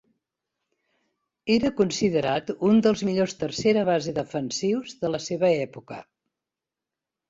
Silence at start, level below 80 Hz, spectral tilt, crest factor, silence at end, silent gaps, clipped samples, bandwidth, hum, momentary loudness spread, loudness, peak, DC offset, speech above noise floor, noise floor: 1.45 s; -60 dBFS; -5.5 dB/octave; 18 dB; 1.25 s; none; under 0.1%; 7.8 kHz; none; 10 LU; -24 LUFS; -8 dBFS; under 0.1%; 64 dB; -88 dBFS